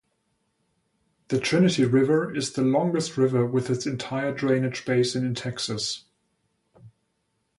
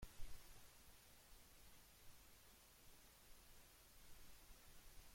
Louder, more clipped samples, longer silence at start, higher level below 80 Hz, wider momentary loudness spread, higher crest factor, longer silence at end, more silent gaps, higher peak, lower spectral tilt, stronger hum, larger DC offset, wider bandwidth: first, -24 LUFS vs -66 LUFS; neither; first, 1.3 s vs 0 s; about the same, -64 dBFS vs -66 dBFS; first, 8 LU vs 3 LU; about the same, 16 dB vs 20 dB; first, 0.7 s vs 0 s; neither; first, -10 dBFS vs -38 dBFS; first, -5.5 dB/octave vs -2.5 dB/octave; neither; neither; second, 11.5 kHz vs 16.5 kHz